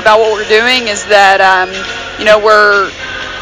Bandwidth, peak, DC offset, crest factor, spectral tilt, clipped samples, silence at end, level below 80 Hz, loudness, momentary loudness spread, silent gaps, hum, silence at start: 8 kHz; 0 dBFS; under 0.1%; 10 dB; -2 dB/octave; 3%; 0 s; -40 dBFS; -8 LUFS; 13 LU; none; none; 0 s